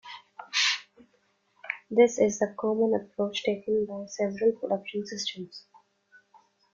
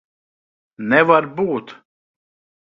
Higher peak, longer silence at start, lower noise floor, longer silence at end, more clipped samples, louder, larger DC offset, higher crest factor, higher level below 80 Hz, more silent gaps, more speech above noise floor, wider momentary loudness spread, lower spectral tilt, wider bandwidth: second, -8 dBFS vs 0 dBFS; second, 0.05 s vs 0.8 s; second, -70 dBFS vs under -90 dBFS; first, 1.15 s vs 0.95 s; neither; second, -28 LUFS vs -17 LUFS; neither; about the same, 22 dB vs 20 dB; second, -72 dBFS vs -62 dBFS; neither; second, 42 dB vs over 73 dB; first, 19 LU vs 14 LU; second, -3.5 dB/octave vs -8 dB/octave; first, 7.6 kHz vs 6.2 kHz